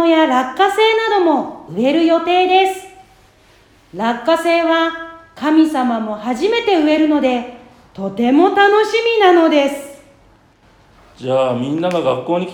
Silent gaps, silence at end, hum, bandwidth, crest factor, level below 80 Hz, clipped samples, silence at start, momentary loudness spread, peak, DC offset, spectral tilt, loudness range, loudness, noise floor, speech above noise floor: none; 0 s; none; 18 kHz; 16 dB; -56 dBFS; under 0.1%; 0 s; 14 LU; 0 dBFS; under 0.1%; -5 dB/octave; 4 LU; -15 LUFS; -50 dBFS; 36 dB